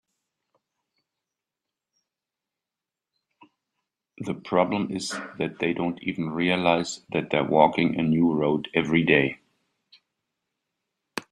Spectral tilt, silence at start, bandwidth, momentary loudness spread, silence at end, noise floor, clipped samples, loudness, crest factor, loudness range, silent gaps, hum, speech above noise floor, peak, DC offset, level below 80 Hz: -5.5 dB/octave; 4.2 s; 12.5 kHz; 13 LU; 0.1 s; -89 dBFS; under 0.1%; -24 LUFS; 24 dB; 9 LU; none; none; 65 dB; -4 dBFS; under 0.1%; -62 dBFS